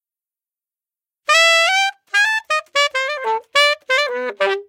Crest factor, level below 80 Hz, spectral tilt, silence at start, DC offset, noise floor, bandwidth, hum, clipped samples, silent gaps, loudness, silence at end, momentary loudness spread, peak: 18 dB; -70 dBFS; 2 dB/octave; 1.3 s; under 0.1%; under -90 dBFS; 16.5 kHz; none; under 0.1%; none; -16 LUFS; 0.05 s; 9 LU; 0 dBFS